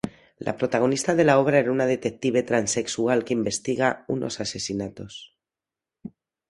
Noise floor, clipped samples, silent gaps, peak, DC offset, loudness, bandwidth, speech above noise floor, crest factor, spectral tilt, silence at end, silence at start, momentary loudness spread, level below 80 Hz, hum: -89 dBFS; under 0.1%; none; -4 dBFS; under 0.1%; -24 LUFS; 11.5 kHz; 66 dB; 20 dB; -4.5 dB/octave; 0.4 s; 0.05 s; 20 LU; -60 dBFS; none